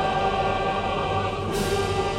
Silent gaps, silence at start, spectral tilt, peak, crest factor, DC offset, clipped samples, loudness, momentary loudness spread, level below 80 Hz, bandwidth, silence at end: none; 0 s; -5 dB/octave; -10 dBFS; 14 dB; under 0.1%; under 0.1%; -25 LUFS; 3 LU; -38 dBFS; 16 kHz; 0 s